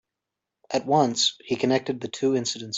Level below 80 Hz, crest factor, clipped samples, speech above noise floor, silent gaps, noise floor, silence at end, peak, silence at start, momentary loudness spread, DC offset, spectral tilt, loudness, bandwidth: -68 dBFS; 18 dB; under 0.1%; 61 dB; none; -86 dBFS; 0 s; -6 dBFS; 0.7 s; 8 LU; under 0.1%; -3.5 dB/octave; -24 LUFS; 8.2 kHz